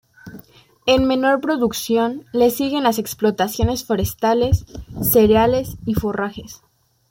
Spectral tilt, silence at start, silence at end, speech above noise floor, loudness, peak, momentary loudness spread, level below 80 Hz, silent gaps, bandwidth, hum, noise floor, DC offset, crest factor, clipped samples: -5.5 dB/octave; 0.25 s; 0.55 s; 28 dB; -18 LUFS; -2 dBFS; 9 LU; -38 dBFS; none; 17 kHz; none; -46 dBFS; under 0.1%; 16 dB; under 0.1%